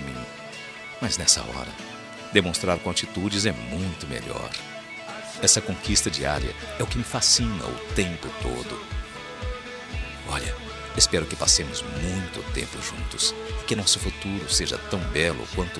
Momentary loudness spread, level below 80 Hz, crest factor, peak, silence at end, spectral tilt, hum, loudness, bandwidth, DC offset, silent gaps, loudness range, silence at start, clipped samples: 16 LU; -38 dBFS; 26 dB; -2 dBFS; 0 s; -2.5 dB/octave; none; -24 LUFS; 14 kHz; under 0.1%; none; 4 LU; 0 s; under 0.1%